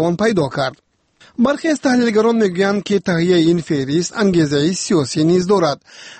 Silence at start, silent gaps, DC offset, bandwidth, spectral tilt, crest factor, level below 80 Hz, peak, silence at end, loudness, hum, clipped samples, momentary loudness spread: 0 s; none; under 0.1%; 8.8 kHz; -5.5 dB/octave; 12 dB; -52 dBFS; -4 dBFS; 0.05 s; -16 LUFS; none; under 0.1%; 6 LU